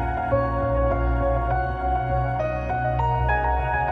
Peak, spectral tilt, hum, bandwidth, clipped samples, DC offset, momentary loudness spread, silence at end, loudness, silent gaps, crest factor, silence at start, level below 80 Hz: -8 dBFS; -9 dB/octave; none; 4.7 kHz; under 0.1%; under 0.1%; 3 LU; 0 s; -24 LUFS; none; 14 dB; 0 s; -28 dBFS